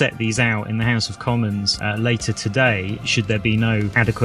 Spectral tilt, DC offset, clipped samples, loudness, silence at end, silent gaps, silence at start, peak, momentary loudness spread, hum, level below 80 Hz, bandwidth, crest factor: -5 dB/octave; under 0.1%; under 0.1%; -20 LUFS; 0 s; none; 0 s; -2 dBFS; 4 LU; none; -42 dBFS; 11.5 kHz; 18 dB